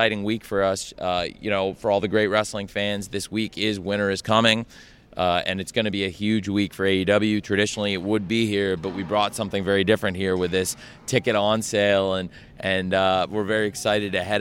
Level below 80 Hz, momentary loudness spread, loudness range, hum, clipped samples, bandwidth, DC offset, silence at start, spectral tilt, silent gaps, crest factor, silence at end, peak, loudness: -54 dBFS; 7 LU; 2 LU; none; under 0.1%; 16.5 kHz; under 0.1%; 0 s; -4.5 dB/octave; none; 20 dB; 0 s; -4 dBFS; -23 LUFS